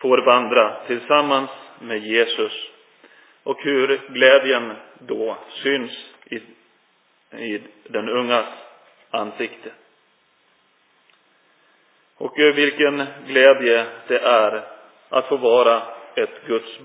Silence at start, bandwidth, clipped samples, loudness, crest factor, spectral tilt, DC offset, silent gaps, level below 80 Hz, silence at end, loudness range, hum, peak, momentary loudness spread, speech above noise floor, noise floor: 0 s; 4 kHz; under 0.1%; -19 LUFS; 20 dB; -7 dB/octave; under 0.1%; none; -84 dBFS; 0.05 s; 11 LU; none; 0 dBFS; 18 LU; 42 dB; -61 dBFS